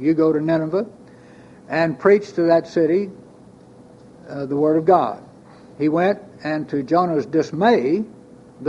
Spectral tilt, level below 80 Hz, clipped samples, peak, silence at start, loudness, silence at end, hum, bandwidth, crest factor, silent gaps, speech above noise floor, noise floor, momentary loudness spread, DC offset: -7.5 dB/octave; -62 dBFS; under 0.1%; -2 dBFS; 0 s; -19 LUFS; 0 s; none; 7.8 kHz; 18 dB; none; 27 dB; -45 dBFS; 10 LU; under 0.1%